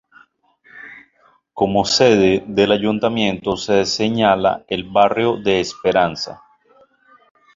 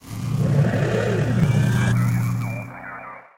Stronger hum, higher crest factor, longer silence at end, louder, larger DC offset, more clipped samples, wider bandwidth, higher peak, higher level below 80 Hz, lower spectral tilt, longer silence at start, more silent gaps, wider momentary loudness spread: neither; about the same, 16 dB vs 14 dB; first, 1.2 s vs 0.15 s; first, -17 LUFS vs -21 LUFS; second, under 0.1% vs 0.2%; neither; second, 7.8 kHz vs 16 kHz; first, -2 dBFS vs -8 dBFS; second, -50 dBFS vs -42 dBFS; second, -4.5 dB/octave vs -7 dB/octave; first, 0.75 s vs 0.05 s; neither; about the same, 13 LU vs 15 LU